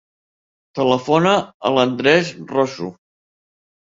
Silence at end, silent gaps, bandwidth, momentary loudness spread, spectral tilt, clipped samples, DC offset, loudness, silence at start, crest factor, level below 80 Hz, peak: 0.95 s; 1.54-1.60 s; 7.8 kHz; 12 LU; -5.5 dB/octave; under 0.1%; under 0.1%; -17 LUFS; 0.75 s; 18 dB; -60 dBFS; -2 dBFS